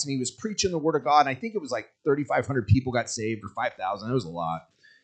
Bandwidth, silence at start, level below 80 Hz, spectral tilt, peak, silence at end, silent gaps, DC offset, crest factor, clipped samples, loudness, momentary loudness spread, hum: 9.2 kHz; 0 s; -56 dBFS; -5 dB/octave; -6 dBFS; 0.45 s; none; under 0.1%; 20 dB; under 0.1%; -27 LUFS; 10 LU; none